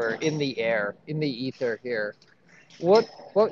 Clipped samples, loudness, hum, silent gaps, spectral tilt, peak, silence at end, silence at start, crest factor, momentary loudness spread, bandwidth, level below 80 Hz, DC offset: under 0.1%; -26 LUFS; none; none; -6 dB/octave; -8 dBFS; 0 s; 0 s; 18 dB; 9 LU; 7.2 kHz; -78 dBFS; under 0.1%